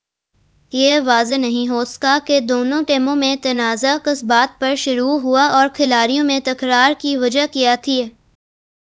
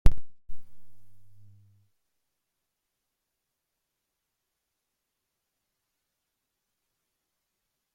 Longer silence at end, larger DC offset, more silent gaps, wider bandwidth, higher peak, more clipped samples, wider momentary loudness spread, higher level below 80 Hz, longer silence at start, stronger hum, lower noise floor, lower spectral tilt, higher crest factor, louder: second, 0.85 s vs 6.85 s; neither; neither; first, 8 kHz vs 3.8 kHz; first, 0 dBFS vs -4 dBFS; neither; second, 5 LU vs 22 LU; second, -60 dBFS vs -38 dBFS; first, 0.75 s vs 0.05 s; neither; second, -62 dBFS vs -84 dBFS; second, -2 dB/octave vs -7 dB/octave; second, 16 dB vs 26 dB; first, -16 LUFS vs -34 LUFS